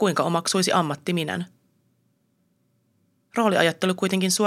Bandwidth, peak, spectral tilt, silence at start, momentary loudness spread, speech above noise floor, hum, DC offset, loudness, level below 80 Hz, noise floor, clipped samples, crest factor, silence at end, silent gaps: 15.5 kHz; -2 dBFS; -4 dB/octave; 0 s; 10 LU; 46 dB; none; under 0.1%; -23 LUFS; -74 dBFS; -68 dBFS; under 0.1%; 22 dB; 0 s; none